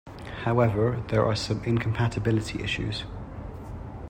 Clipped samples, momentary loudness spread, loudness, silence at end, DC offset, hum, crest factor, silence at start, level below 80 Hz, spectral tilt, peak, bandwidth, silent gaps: under 0.1%; 16 LU; -26 LUFS; 0 s; under 0.1%; none; 18 dB; 0.05 s; -44 dBFS; -6.5 dB/octave; -10 dBFS; 10 kHz; none